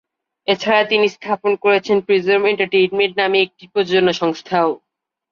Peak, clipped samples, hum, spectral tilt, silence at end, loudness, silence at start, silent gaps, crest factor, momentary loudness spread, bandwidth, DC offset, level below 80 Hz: -2 dBFS; under 0.1%; none; -5 dB/octave; 0.55 s; -17 LUFS; 0.5 s; none; 14 dB; 6 LU; 7 kHz; under 0.1%; -62 dBFS